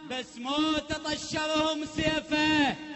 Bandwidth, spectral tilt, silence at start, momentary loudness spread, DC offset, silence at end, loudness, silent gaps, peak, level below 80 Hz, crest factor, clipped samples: 8.4 kHz; -3.5 dB/octave; 0 s; 7 LU; under 0.1%; 0 s; -28 LUFS; none; -14 dBFS; -52 dBFS; 14 dB; under 0.1%